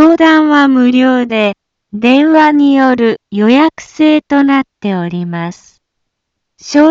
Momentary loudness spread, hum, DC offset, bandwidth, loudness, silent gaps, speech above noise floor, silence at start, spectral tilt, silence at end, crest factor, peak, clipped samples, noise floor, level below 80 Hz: 11 LU; none; under 0.1%; 7.6 kHz; -10 LUFS; none; 63 dB; 0 s; -6 dB/octave; 0 s; 10 dB; 0 dBFS; under 0.1%; -72 dBFS; -56 dBFS